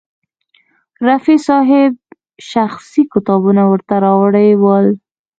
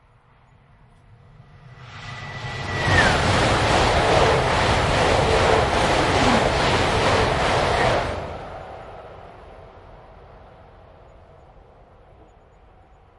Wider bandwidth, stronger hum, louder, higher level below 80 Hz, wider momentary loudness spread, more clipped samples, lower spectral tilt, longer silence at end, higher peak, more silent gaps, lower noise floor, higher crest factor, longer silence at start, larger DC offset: second, 7.8 kHz vs 11.5 kHz; neither; first, -12 LUFS vs -19 LUFS; second, -58 dBFS vs -36 dBFS; second, 7 LU vs 19 LU; neither; first, -8 dB/octave vs -4.5 dB/octave; second, 0.45 s vs 2.8 s; first, 0 dBFS vs -4 dBFS; neither; about the same, -57 dBFS vs -54 dBFS; second, 12 dB vs 18 dB; second, 1 s vs 1.65 s; neither